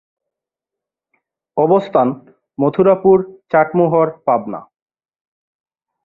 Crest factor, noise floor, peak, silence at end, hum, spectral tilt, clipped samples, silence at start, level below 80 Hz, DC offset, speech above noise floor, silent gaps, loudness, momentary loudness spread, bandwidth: 16 dB; -85 dBFS; -2 dBFS; 1.45 s; none; -10 dB/octave; under 0.1%; 1.55 s; -58 dBFS; under 0.1%; 71 dB; none; -15 LUFS; 15 LU; 4.3 kHz